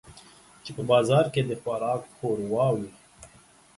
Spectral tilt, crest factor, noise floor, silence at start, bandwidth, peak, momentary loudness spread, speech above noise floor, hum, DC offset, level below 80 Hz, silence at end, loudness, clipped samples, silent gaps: -6.5 dB/octave; 20 dB; -56 dBFS; 0.05 s; 11.5 kHz; -8 dBFS; 16 LU; 30 dB; none; under 0.1%; -62 dBFS; 0.5 s; -26 LUFS; under 0.1%; none